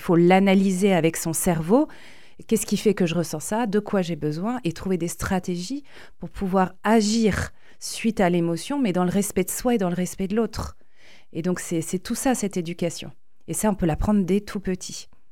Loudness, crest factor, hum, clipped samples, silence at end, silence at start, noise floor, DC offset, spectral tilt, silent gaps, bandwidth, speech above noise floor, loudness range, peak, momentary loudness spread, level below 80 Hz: -23 LUFS; 20 dB; none; under 0.1%; 0.3 s; 0 s; -55 dBFS; 0.9%; -5.5 dB/octave; none; 17 kHz; 32 dB; 4 LU; -4 dBFS; 12 LU; -44 dBFS